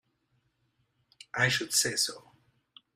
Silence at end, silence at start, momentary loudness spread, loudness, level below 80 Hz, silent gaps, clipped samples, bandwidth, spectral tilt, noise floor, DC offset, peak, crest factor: 0.75 s; 1.35 s; 13 LU; -28 LUFS; -72 dBFS; none; under 0.1%; 16 kHz; -1.5 dB/octave; -75 dBFS; under 0.1%; -12 dBFS; 22 dB